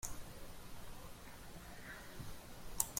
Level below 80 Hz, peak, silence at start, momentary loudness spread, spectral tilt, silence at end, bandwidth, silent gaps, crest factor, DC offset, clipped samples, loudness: -56 dBFS; -12 dBFS; 0 s; 5 LU; -2.5 dB/octave; 0 s; 16.5 kHz; none; 34 dB; under 0.1%; under 0.1%; -51 LUFS